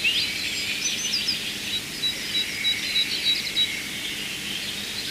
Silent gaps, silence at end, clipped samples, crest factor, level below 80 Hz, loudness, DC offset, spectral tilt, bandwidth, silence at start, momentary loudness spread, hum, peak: none; 0 s; under 0.1%; 18 dB; -56 dBFS; -24 LUFS; under 0.1%; 0 dB/octave; 16 kHz; 0 s; 7 LU; 50 Hz at -50 dBFS; -10 dBFS